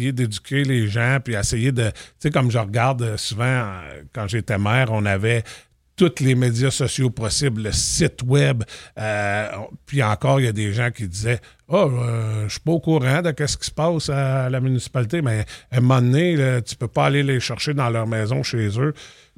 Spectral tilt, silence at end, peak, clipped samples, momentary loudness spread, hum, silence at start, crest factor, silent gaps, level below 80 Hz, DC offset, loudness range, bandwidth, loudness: -5.5 dB/octave; 0.25 s; -2 dBFS; under 0.1%; 7 LU; none; 0 s; 18 dB; none; -44 dBFS; under 0.1%; 2 LU; 14 kHz; -21 LUFS